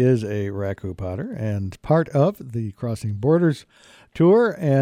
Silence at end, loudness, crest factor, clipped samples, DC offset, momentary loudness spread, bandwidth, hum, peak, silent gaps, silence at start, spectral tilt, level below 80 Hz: 0 s; -22 LUFS; 14 dB; under 0.1%; under 0.1%; 13 LU; 16 kHz; none; -6 dBFS; none; 0 s; -8.5 dB/octave; -52 dBFS